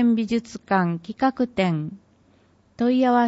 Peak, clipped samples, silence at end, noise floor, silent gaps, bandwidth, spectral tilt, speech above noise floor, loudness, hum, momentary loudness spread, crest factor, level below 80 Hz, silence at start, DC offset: -6 dBFS; under 0.1%; 0 s; -58 dBFS; none; 8 kHz; -7 dB/octave; 37 dB; -23 LUFS; none; 7 LU; 16 dB; -60 dBFS; 0 s; under 0.1%